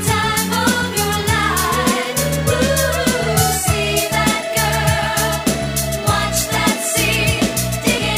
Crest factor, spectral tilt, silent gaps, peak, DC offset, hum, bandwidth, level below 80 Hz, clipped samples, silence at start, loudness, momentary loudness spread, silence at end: 14 dB; -3.5 dB/octave; none; -2 dBFS; under 0.1%; none; 16 kHz; -32 dBFS; under 0.1%; 0 s; -16 LUFS; 2 LU; 0 s